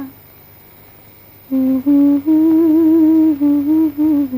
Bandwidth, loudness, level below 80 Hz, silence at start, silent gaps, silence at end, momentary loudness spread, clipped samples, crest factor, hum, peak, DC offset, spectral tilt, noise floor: 15.5 kHz; -13 LUFS; -54 dBFS; 0 s; none; 0 s; 6 LU; under 0.1%; 10 dB; none; -4 dBFS; under 0.1%; -8.5 dB/octave; -42 dBFS